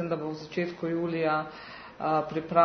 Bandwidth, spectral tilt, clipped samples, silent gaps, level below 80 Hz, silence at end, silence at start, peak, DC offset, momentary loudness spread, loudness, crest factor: 6.6 kHz; -7.5 dB/octave; under 0.1%; none; -64 dBFS; 0 s; 0 s; -8 dBFS; under 0.1%; 11 LU; -30 LUFS; 20 dB